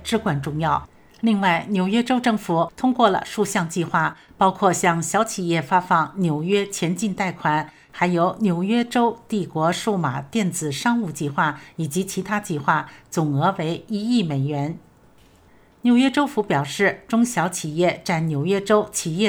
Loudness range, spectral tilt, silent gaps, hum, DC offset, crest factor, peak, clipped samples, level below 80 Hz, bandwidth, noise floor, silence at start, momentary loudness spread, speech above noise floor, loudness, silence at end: 3 LU; -5 dB/octave; none; none; under 0.1%; 20 dB; -2 dBFS; under 0.1%; -56 dBFS; over 20 kHz; -53 dBFS; 0 s; 7 LU; 32 dB; -22 LUFS; 0 s